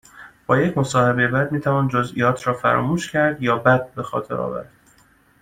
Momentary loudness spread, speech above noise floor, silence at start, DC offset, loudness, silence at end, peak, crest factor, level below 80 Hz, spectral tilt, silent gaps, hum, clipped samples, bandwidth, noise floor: 9 LU; 36 dB; 0.15 s; under 0.1%; -20 LUFS; 0.8 s; -2 dBFS; 18 dB; -52 dBFS; -6.5 dB/octave; none; none; under 0.1%; 15 kHz; -56 dBFS